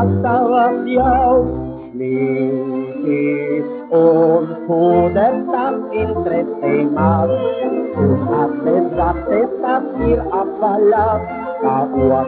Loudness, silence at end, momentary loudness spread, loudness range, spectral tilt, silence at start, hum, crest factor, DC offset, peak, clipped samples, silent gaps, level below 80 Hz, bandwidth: -16 LUFS; 0 s; 7 LU; 2 LU; -7.5 dB/octave; 0 s; none; 14 dB; under 0.1%; 0 dBFS; under 0.1%; none; -36 dBFS; 4.5 kHz